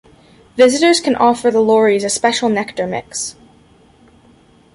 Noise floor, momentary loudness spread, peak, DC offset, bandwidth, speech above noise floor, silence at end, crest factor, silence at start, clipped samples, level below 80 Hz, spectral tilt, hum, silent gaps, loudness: -48 dBFS; 12 LU; -2 dBFS; under 0.1%; 11.5 kHz; 35 dB; 1.45 s; 14 dB; 0.55 s; under 0.1%; -54 dBFS; -3 dB/octave; none; none; -14 LUFS